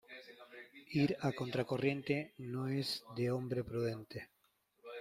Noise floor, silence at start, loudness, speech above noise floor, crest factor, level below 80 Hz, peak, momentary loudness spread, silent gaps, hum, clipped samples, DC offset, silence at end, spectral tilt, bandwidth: -68 dBFS; 0.1 s; -38 LUFS; 31 dB; 20 dB; -70 dBFS; -20 dBFS; 19 LU; none; none; under 0.1%; under 0.1%; 0 s; -6.5 dB/octave; 15.5 kHz